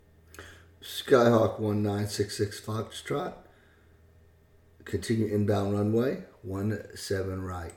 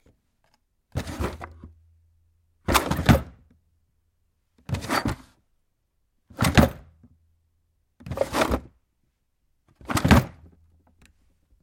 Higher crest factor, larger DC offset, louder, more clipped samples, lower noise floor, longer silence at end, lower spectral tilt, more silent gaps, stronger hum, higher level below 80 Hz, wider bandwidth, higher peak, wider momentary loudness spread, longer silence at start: second, 22 dB vs 28 dB; neither; second, -29 LUFS vs -24 LUFS; neither; second, -59 dBFS vs -72 dBFS; second, 0 s vs 1.35 s; about the same, -6 dB/octave vs -5.5 dB/octave; neither; neither; second, -60 dBFS vs -38 dBFS; first, 18.5 kHz vs 16.5 kHz; second, -8 dBFS vs 0 dBFS; second, 16 LU vs 22 LU; second, 0.35 s vs 0.95 s